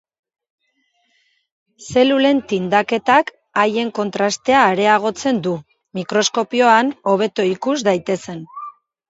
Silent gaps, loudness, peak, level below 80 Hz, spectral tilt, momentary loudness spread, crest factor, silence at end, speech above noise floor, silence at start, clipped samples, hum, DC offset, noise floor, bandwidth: none; -17 LUFS; 0 dBFS; -60 dBFS; -4 dB/octave; 15 LU; 18 dB; 0.4 s; 49 dB; 1.8 s; under 0.1%; none; under 0.1%; -66 dBFS; 8 kHz